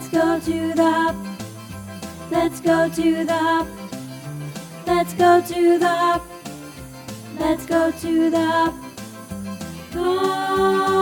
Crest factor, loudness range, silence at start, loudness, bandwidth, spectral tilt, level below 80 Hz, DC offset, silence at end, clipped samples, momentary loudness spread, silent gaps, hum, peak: 18 dB; 3 LU; 0 s; -20 LUFS; 19 kHz; -5 dB/octave; -48 dBFS; under 0.1%; 0 s; under 0.1%; 18 LU; none; none; -4 dBFS